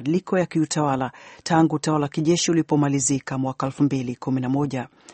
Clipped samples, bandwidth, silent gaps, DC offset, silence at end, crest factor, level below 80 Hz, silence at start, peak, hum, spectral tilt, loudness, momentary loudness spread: under 0.1%; 8.8 kHz; none; under 0.1%; 0 s; 18 dB; -58 dBFS; 0 s; -4 dBFS; none; -5 dB/octave; -23 LUFS; 7 LU